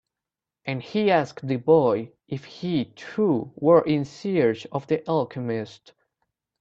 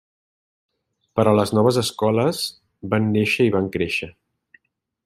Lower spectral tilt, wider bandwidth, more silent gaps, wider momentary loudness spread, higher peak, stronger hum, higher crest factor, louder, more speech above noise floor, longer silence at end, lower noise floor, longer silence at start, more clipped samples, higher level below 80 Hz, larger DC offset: first, -7.5 dB/octave vs -5.5 dB/octave; second, 7.6 kHz vs 14.5 kHz; neither; first, 13 LU vs 10 LU; about the same, -4 dBFS vs -2 dBFS; neither; about the same, 20 dB vs 20 dB; second, -24 LUFS vs -20 LUFS; first, 65 dB vs 47 dB; about the same, 0.9 s vs 0.95 s; first, -88 dBFS vs -66 dBFS; second, 0.65 s vs 1.15 s; neither; second, -64 dBFS vs -58 dBFS; neither